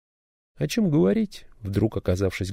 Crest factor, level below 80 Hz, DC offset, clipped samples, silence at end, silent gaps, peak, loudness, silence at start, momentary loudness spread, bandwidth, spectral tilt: 14 dB; -46 dBFS; under 0.1%; under 0.1%; 0 s; none; -10 dBFS; -24 LUFS; 0.6 s; 11 LU; 16 kHz; -7 dB/octave